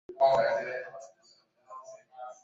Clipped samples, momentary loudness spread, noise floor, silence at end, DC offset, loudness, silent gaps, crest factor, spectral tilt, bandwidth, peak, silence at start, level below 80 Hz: under 0.1%; 25 LU; -65 dBFS; 0.1 s; under 0.1%; -28 LUFS; none; 18 dB; -4 dB/octave; 7.6 kHz; -14 dBFS; 0.1 s; -72 dBFS